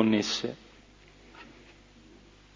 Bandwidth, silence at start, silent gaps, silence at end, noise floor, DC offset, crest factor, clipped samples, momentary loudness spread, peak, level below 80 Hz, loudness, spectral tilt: 7.6 kHz; 0 s; none; 1.1 s; -55 dBFS; under 0.1%; 24 dB; under 0.1%; 28 LU; -10 dBFS; -62 dBFS; -29 LUFS; -4.5 dB/octave